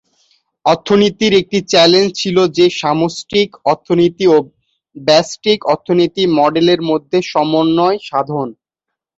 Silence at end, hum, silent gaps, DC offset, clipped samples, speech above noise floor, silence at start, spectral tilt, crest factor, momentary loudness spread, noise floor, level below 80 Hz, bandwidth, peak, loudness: 0.65 s; none; none; under 0.1%; under 0.1%; 67 dB; 0.65 s; -5 dB/octave; 14 dB; 7 LU; -80 dBFS; -54 dBFS; 8 kHz; 0 dBFS; -13 LUFS